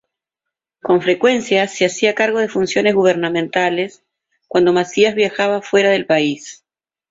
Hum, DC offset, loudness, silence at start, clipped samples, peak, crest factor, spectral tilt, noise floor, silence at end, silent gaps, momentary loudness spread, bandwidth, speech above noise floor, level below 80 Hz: none; under 0.1%; -16 LUFS; 0.85 s; under 0.1%; -2 dBFS; 16 dB; -4.5 dB/octave; -83 dBFS; 0.55 s; none; 7 LU; 7.8 kHz; 67 dB; -60 dBFS